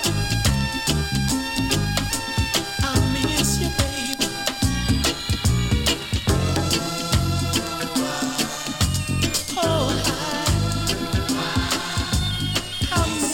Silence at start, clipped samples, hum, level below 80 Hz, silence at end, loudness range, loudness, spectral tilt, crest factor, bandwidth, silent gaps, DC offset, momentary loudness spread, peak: 0 s; under 0.1%; none; -32 dBFS; 0 s; 1 LU; -22 LUFS; -4 dB/octave; 16 dB; 17 kHz; none; under 0.1%; 3 LU; -6 dBFS